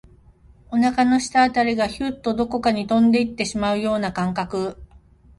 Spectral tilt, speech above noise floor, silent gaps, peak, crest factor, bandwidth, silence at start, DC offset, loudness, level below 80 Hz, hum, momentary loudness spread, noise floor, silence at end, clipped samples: -5 dB/octave; 31 dB; none; -6 dBFS; 16 dB; 11.5 kHz; 0.7 s; under 0.1%; -21 LUFS; -48 dBFS; none; 8 LU; -51 dBFS; 0.55 s; under 0.1%